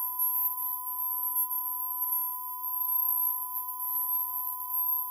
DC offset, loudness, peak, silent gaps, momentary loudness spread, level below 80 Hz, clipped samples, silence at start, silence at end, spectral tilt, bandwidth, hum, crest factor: under 0.1%; -28 LUFS; -14 dBFS; none; 6 LU; under -90 dBFS; under 0.1%; 0 s; 0 s; 6.5 dB/octave; over 20 kHz; none; 16 dB